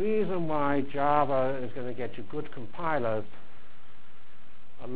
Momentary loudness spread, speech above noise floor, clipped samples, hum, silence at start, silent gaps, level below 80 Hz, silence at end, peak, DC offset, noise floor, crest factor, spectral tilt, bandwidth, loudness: 13 LU; 29 dB; under 0.1%; none; 0 s; none; -58 dBFS; 0 s; -12 dBFS; 4%; -58 dBFS; 20 dB; -10 dB/octave; 4 kHz; -30 LUFS